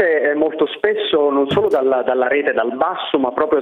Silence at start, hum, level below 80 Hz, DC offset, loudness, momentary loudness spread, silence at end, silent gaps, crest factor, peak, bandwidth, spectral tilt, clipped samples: 0 s; none; -56 dBFS; under 0.1%; -17 LUFS; 3 LU; 0 s; none; 16 dB; -2 dBFS; 4.2 kHz; -6.5 dB/octave; under 0.1%